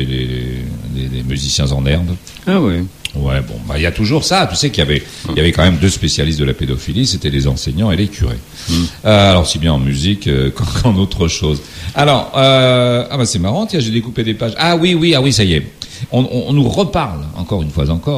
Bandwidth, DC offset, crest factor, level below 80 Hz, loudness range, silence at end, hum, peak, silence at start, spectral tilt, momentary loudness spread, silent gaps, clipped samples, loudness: 15.5 kHz; under 0.1%; 14 dB; -26 dBFS; 3 LU; 0 s; none; 0 dBFS; 0 s; -5 dB/octave; 10 LU; none; under 0.1%; -14 LUFS